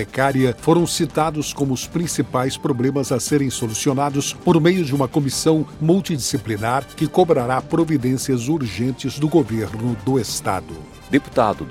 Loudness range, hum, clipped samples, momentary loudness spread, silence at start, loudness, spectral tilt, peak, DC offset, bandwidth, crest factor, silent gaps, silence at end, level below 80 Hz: 2 LU; none; under 0.1%; 6 LU; 0 s; -20 LUFS; -5.5 dB/octave; -2 dBFS; under 0.1%; 16.5 kHz; 18 dB; none; 0 s; -46 dBFS